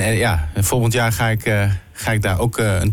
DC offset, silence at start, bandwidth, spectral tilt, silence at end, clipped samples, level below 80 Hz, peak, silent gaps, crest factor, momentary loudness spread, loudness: under 0.1%; 0 s; 17.5 kHz; -5 dB/octave; 0 s; under 0.1%; -34 dBFS; -8 dBFS; none; 10 dB; 4 LU; -18 LUFS